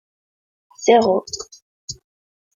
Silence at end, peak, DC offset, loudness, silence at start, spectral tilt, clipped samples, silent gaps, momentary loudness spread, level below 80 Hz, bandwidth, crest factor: 0.65 s; -2 dBFS; under 0.1%; -17 LUFS; 0.8 s; -3.5 dB/octave; under 0.1%; 1.62-1.88 s; 22 LU; -60 dBFS; 7.6 kHz; 20 dB